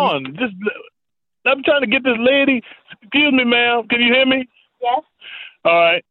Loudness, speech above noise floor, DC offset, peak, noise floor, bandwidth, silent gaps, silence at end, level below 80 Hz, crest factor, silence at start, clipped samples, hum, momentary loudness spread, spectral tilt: -16 LUFS; 69 dB; under 0.1%; -2 dBFS; -86 dBFS; 5 kHz; none; 0.1 s; -60 dBFS; 14 dB; 0 s; under 0.1%; none; 13 LU; -7.5 dB/octave